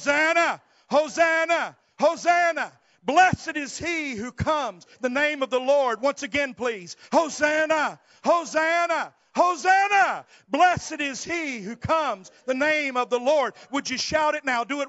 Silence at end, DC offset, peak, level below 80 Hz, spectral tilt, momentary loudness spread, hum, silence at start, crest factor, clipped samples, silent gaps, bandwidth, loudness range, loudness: 0 s; under 0.1%; -6 dBFS; -56 dBFS; -2 dB/octave; 10 LU; none; 0 s; 18 dB; under 0.1%; none; 8 kHz; 3 LU; -23 LUFS